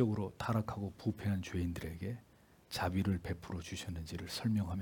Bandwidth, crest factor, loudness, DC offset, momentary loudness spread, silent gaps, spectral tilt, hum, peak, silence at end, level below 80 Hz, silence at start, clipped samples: 18 kHz; 20 dB; -39 LUFS; under 0.1%; 9 LU; none; -6.5 dB/octave; none; -18 dBFS; 0 s; -60 dBFS; 0 s; under 0.1%